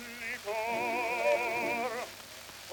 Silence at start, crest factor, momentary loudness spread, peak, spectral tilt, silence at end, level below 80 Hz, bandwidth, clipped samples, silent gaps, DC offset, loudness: 0 s; 16 dB; 15 LU; -18 dBFS; -2.5 dB/octave; 0 s; -68 dBFS; 19 kHz; under 0.1%; none; under 0.1%; -32 LUFS